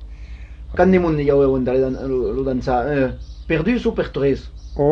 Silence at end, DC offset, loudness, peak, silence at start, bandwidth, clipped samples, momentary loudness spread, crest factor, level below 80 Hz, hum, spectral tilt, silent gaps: 0 s; under 0.1%; -19 LUFS; -2 dBFS; 0 s; 7 kHz; under 0.1%; 18 LU; 16 dB; -34 dBFS; none; -8.5 dB/octave; none